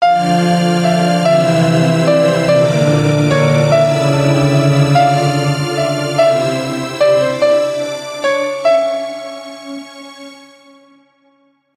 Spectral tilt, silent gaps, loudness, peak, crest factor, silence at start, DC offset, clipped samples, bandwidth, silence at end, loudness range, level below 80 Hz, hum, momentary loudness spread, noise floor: -6 dB/octave; none; -13 LUFS; 0 dBFS; 12 dB; 0 s; under 0.1%; under 0.1%; 14 kHz; 1.45 s; 7 LU; -50 dBFS; none; 15 LU; -56 dBFS